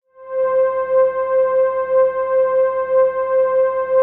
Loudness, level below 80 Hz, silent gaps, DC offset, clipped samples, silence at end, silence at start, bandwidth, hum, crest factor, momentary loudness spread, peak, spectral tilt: -17 LUFS; -60 dBFS; none; under 0.1%; under 0.1%; 0 s; 0.2 s; 3.3 kHz; none; 10 dB; 2 LU; -6 dBFS; -3 dB/octave